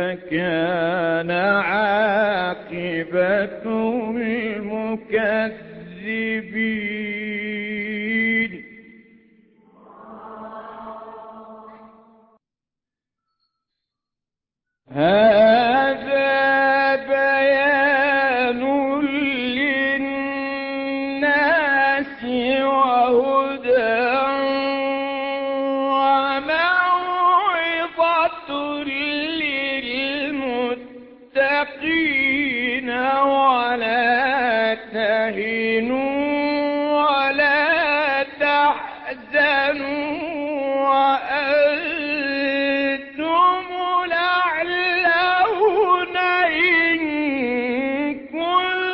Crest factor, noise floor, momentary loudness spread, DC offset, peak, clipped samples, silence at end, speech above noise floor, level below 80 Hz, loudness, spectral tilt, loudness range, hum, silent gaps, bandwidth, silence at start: 14 dB; -87 dBFS; 9 LU; under 0.1%; -6 dBFS; under 0.1%; 0 s; 67 dB; -58 dBFS; -19 LUFS; -9 dB/octave; 7 LU; none; none; 5.8 kHz; 0 s